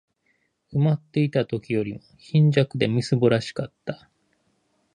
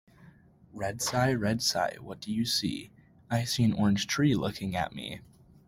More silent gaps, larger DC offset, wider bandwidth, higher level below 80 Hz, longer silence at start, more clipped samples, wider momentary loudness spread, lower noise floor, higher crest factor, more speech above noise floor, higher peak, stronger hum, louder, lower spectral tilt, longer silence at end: neither; neither; second, 9.8 kHz vs 16.5 kHz; about the same, -60 dBFS vs -58 dBFS; first, 0.7 s vs 0.2 s; neither; about the same, 15 LU vs 14 LU; first, -70 dBFS vs -57 dBFS; about the same, 20 dB vs 18 dB; first, 47 dB vs 27 dB; first, -4 dBFS vs -12 dBFS; neither; first, -23 LUFS vs -29 LUFS; first, -7.5 dB/octave vs -4.5 dB/octave; first, 1 s vs 0.45 s